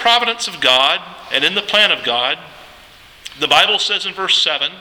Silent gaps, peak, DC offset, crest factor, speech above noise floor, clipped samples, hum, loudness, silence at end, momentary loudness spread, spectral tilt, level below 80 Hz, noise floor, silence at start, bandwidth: none; 0 dBFS; under 0.1%; 16 dB; 27 dB; under 0.1%; none; -14 LUFS; 0 s; 9 LU; -0.5 dB/octave; -56 dBFS; -43 dBFS; 0 s; over 20 kHz